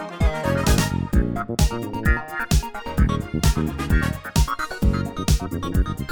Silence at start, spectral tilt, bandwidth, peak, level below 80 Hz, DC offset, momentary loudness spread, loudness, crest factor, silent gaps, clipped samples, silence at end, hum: 0 s; -5.5 dB/octave; over 20 kHz; -6 dBFS; -24 dBFS; under 0.1%; 4 LU; -23 LUFS; 16 dB; none; under 0.1%; 0 s; none